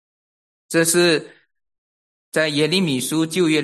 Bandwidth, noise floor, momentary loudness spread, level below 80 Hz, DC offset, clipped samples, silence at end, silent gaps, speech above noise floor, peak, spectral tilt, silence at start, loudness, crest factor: 12.5 kHz; under -90 dBFS; 8 LU; -68 dBFS; under 0.1%; under 0.1%; 0 s; 1.78-2.32 s; over 72 dB; -4 dBFS; -3.5 dB/octave; 0.7 s; -19 LUFS; 16 dB